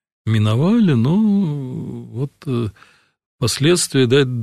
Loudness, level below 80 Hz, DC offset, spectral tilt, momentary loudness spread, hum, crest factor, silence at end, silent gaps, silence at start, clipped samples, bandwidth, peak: -17 LUFS; -52 dBFS; under 0.1%; -5.5 dB/octave; 13 LU; none; 14 dB; 0 s; 3.26-3.39 s; 0.25 s; under 0.1%; 13.5 kHz; -4 dBFS